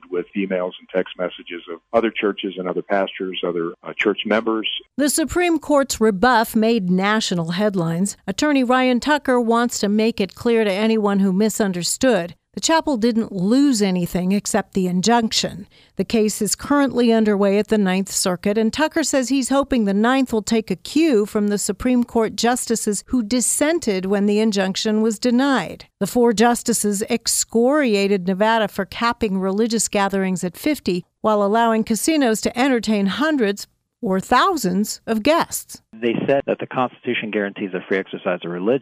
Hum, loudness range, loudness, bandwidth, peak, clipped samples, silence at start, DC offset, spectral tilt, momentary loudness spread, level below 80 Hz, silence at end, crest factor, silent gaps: none; 3 LU; -19 LUFS; 15.5 kHz; -4 dBFS; under 0.1%; 0.1 s; under 0.1%; -4 dB/octave; 8 LU; -50 dBFS; 0 s; 16 dB; none